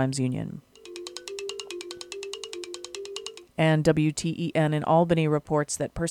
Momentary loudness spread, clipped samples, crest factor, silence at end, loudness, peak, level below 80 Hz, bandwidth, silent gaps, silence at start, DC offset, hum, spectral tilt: 16 LU; under 0.1%; 20 dB; 0 s; -27 LUFS; -8 dBFS; -54 dBFS; 13 kHz; none; 0 s; under 0.1%; none; -5.5 dB/octave